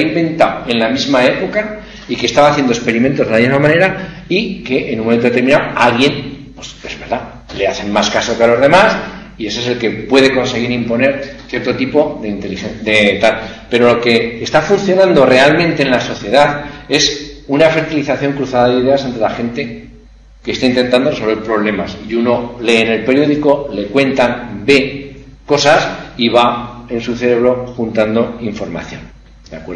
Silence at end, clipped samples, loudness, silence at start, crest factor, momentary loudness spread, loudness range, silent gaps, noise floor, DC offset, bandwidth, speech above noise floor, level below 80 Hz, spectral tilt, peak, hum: 0 s; 0.2%; -13 LUFS; 0 s; 14 dB; 13 LU; 4 LU; none; -40 dBFS; under 0.1%; 10.5 kHz; 27 dB; -40 dBFS; -5 dB/octave; 0 dBFS; none